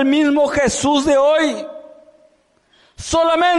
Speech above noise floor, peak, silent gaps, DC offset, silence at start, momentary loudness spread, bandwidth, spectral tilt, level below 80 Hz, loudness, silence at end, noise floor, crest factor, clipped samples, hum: 42 dB; -6 dBFS; none; under 0.1%; 0 s; 14 LU; 11.5 kHz; -3.5 dB/octave; -44 dBFS; -15 LUFS; 0 s; -57 dBFS; 10 dB; under 0.1%; none